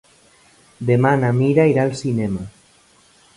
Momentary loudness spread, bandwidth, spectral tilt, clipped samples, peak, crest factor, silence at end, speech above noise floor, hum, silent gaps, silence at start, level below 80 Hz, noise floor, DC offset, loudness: 12 LU; 11.5 kHz; -8 dB/octave; under 0.1%; -2 dBFS; 18 dB; 0.9 s; 37 dB; none; none; 0.8 s; -52 dBFS; -53 dBFS; under 0.1%; -18 LUFS